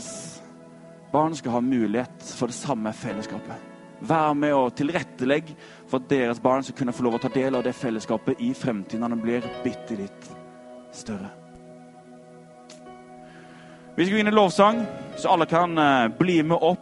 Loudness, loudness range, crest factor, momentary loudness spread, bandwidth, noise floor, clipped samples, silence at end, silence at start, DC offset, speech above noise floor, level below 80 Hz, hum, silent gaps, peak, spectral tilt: -24 LUFS; 15 LU; 22 dB; 24 LU; 11.5 kHz; -47 dBFS; under 0.1%; 0 s; 0 s; under 0.1%; 24 dB; -64 dBFS; none; none; -4 dBFS; -5.5 dB/octave